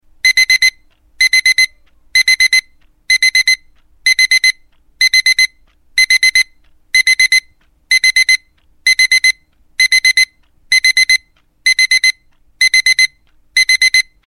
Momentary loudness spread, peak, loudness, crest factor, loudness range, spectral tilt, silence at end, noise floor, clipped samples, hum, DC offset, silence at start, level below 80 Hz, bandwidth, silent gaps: 7 LU; 0 dBFS; -10 LUFS; 14 dB; 1 LU; 5 dB/octave; 0.25 s; -50 dBFS; under 0.1%; none; 0.4%; 0.25 s; -50 dBFS; 17 kHz; none